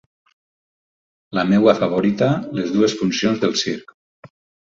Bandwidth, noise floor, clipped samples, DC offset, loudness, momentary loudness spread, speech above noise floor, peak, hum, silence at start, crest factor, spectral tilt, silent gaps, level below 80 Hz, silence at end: 7.6 kHz; under -90 dBFS; under 0.1%; under 0.1%; -18 LUFS; 9 LU; over 72 dB; -2 dBFS; none; 1.3 s; 18 dB; -5.5 dB/octave; none; -58 dBFS; 0.85 s